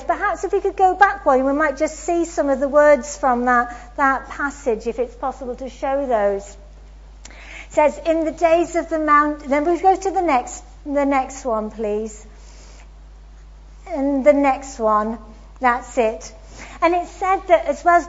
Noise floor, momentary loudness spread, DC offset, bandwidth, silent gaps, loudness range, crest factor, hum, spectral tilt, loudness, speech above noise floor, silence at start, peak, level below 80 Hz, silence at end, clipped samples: -41 dBFS; 13 LU; under 0.1%; 8 kHz; none; 7 LU; 18 dB; none; -4.5 dB/octave; -19 LUFS; 22 dB; 0 s; 0 dBFS; -42 dBFS; 0 s; under 0.1%